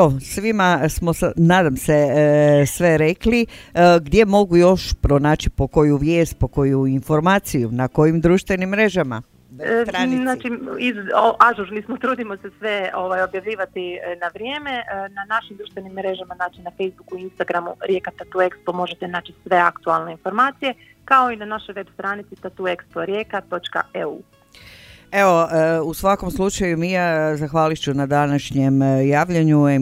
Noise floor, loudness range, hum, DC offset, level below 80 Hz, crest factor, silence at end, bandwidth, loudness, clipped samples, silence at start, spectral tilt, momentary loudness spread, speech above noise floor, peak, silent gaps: -45 dBFS; 10 LU; none; under 0.1%; -38 dBFS; 18 dB; 0 s; 16 kHz; -19 LUFS; under 0.1%; 0 s; -6 dB/octave; 13 LU; 26 dB; 0 dBFS; none